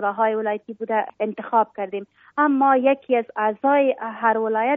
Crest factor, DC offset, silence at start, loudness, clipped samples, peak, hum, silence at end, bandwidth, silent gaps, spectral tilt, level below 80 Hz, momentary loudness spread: 16 dB; under 0.1%; 0 s; -21 LUFS; under 0.1%; -6 dBFS; none; 0 s; 3.8 kHz; none; -3.5 dB/octave; -76 dBFS; 12 LU